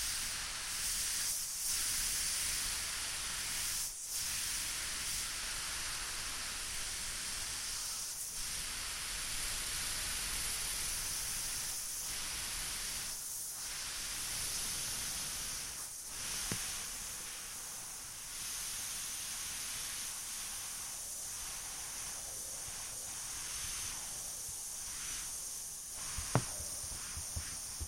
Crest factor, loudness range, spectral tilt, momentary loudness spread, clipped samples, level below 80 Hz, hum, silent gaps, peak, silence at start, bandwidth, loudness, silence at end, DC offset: 28 dB; 5 LU; 0 dB/octave; 6 LU; under 0.1%; -56 dBFS; none; none; -12 dBFS; 0 s; 16.5 kHz; -37 LUFS; 0 s; under 0.1%